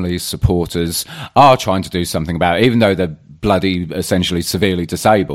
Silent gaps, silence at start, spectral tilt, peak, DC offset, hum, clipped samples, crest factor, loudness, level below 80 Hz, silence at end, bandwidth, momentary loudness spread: none; 0 s; -5 dB/octave; 0 dBFS; under 0.1%; none; under 0.1%; 14 dB; -15 LUFS; -34 dBFS; 0 s; 16.5 kHz; 9 LU